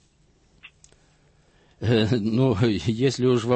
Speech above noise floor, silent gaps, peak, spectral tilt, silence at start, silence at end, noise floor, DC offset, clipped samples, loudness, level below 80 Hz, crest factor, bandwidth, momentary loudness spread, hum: 40 dB; none; -8 dBFS; -7 dB/octave; 0.65 s; 0 s; -61 dBFS; under 0.1%; under 0.1%; -22 LUFS; -52 dBFS; 16 dB; 8.6 kHz; 3 LU; none